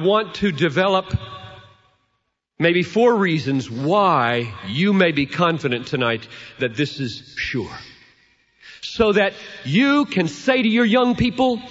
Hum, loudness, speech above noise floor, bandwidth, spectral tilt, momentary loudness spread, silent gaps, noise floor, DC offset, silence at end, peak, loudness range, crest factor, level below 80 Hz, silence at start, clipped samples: none; -19 LUFS; 53 dB; 8 kHz; -6 dB/octave; 12 LU; none; -72 dBFS; under 0.1%; 0 s; -2 dBFS; 5 LU; 18 dB; -48 dBFS; 0 s; under 0.1%